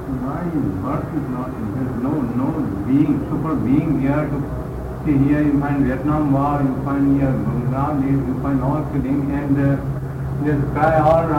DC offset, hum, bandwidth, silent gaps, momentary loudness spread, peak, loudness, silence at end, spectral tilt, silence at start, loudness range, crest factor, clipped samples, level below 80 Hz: under 0.1%; none; 15.5 kHz; none; 8 LU; -6 dBFS; -20 LUFS; 0 s; -9.5 dB/octave; 0 s; 2 LU; 12 dB; under 0.1%; -34 dBFS